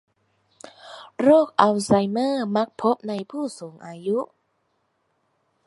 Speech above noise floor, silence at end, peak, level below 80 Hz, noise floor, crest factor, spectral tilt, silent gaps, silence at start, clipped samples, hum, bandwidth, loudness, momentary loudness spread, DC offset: 49 dB; 1.45 s; -2 dBFS; -64 dBFS; -71 dBFS; 22 dB; -6 dB/octave; none; 0.85 s; under 0.1%; none; 11.5 kHz; -22 LUFS; 21 LU; under 0.1%